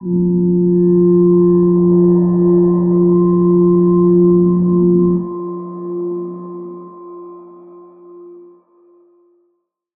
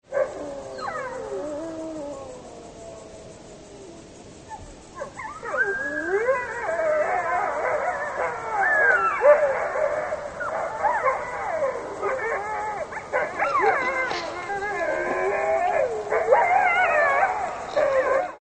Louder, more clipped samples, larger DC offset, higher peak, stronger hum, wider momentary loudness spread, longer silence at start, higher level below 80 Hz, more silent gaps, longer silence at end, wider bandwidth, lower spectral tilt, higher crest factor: first, -12 LUFS vs -24 LUFS; neither; neither; about the same, -4 dBFS vs -4 dBFS; neither; second, 18 LU vs 22 LU; about the same, 0 s vs 0.1 s; first, -46 dBFS vs -56 dBFS; neither; first, 1.6 s vs 0.05 s; second, 1.7 kHz vs 9.4 kHz; first, -16.5 dB/octave vs -4 dB/octave; second, 10 dB vs 20 dB